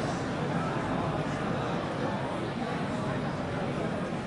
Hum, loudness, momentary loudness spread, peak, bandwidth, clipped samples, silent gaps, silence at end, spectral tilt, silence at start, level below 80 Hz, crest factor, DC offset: none; -32 LUFS; 2 LU; -18 dBFS; 11.5 kHz; under 0.1%; none; 0 s; -6.5 dB/octave; 0 s; -52 dBFS; 14 dB; under 0.1%